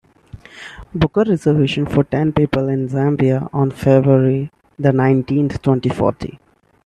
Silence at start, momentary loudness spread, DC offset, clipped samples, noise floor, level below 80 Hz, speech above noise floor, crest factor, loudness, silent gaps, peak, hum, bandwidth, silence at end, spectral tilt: 0.35 s; 15 LU; under 0.1%; under 0.1%; -40 dBFS; -42 dBFS; 25 dB; 16 dB; -16 LUFS; none; 0 dBFS; none; 9.8 kHz; 0.5 s; -8.5 dB/octave